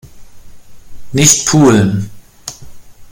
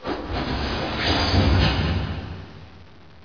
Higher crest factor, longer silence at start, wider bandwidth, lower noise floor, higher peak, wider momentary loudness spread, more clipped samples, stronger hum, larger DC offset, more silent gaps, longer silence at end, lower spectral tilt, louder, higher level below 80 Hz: about the same, 14 dB vs 18 dB; about the same, 0.05 s vs 0 s; first, 17 kHz vs 5.4 kHz; second, -31 dBFS vs -47 dBFS; first, 0 dBFS vs -6 dBFS; first, 21 LU vs 16 LU; neither; neither; second, under 0.1% vs 0.4%; neither; second, 0 s vs 0.4 s; second, -4 dB/octave vs -6 dB/octave; first, -10 LUFS vs -23 LUFS; second, -40 dBFS vs -30 dBFS